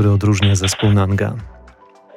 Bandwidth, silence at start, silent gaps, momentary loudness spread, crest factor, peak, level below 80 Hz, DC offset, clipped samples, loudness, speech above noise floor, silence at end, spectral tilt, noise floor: 12.5 kHz; 0 s; none; 8 LU; 14 dB; -2 dBFS; -42 dBFS; under 0.1%; under 0.1%; -16 LUFS; 30 dB; 0.65 s; -5.5 dB/octave; -45 dBFS